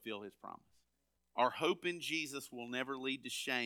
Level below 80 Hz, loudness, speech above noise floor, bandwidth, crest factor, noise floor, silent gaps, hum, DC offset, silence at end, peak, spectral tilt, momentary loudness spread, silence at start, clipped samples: -84 dBFS; -39 LUFS; 44 dB; 19.5 kHz; 22 dB; -83 dBFS; none; none; under 0.1%; 0 s; -20 dBFS; -3 dB/octave; 17 LU; 0 s; under 0.1%